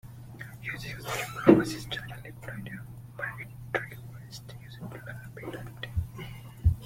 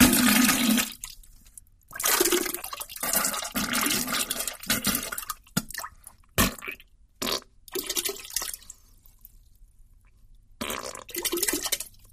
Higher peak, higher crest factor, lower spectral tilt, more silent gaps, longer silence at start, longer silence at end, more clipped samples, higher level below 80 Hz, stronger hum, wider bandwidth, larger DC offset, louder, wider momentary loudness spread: about the same, -4 dBFS vs -2 dBFS; about the same, 26 dB vs 26 dB; first, -6.5 dB/octave vs -2 dB/octave; neither; about the same, 0.05 s vs 0 s; about the same, 0 s vs 0.05 s; neither; about the same, -44 dBFS vs -48 dBFS; neither; about the same, 16.5 kHz vs 15.5 kHz; neither; second, -31 LUFS vs -26 LUFS; first, 20 LU vs 16 LU